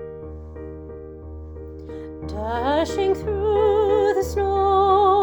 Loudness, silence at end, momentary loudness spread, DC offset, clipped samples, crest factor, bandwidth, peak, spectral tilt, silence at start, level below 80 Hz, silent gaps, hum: -20 LUFS; 0 s; 20 LU; under 0.1%; under 0.1%; 14 dB; 19 kHz; -6 dBFS; -6.5 dB/octave; 0 s; -38 dBFS; none; none